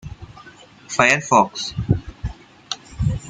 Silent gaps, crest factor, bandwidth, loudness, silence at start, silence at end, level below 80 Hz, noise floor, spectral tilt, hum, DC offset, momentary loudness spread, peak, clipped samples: none; 22 dB; 9.6 kHz; -19 LUFS; 0.05 s; 0 s; -38 dBFS; -45 dBFS; -4.5 dB/octave; none; under 0.1%; 21 LU; 0 dBFS; under 0.1%